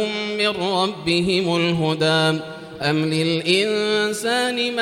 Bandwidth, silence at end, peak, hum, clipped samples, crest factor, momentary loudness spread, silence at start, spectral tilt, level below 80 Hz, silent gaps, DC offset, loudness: 16 kHz; 0 s; -4 dBFS; none; under 0.1%; 18 dB; 4 LU; 0 s; -4.5 dB/octave; -56 dBFS; none; under 0.1%; -20 LUFS